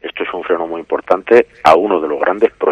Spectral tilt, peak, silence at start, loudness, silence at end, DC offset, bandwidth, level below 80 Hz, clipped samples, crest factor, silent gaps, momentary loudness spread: -5.5 dB/octave; 0 dBFS; 0.05 s; -14 LUFS; 0 s; under 0.1%; 9.8 kHz; -50 dBFS; 0.3%; 14 dB; none; 10 LU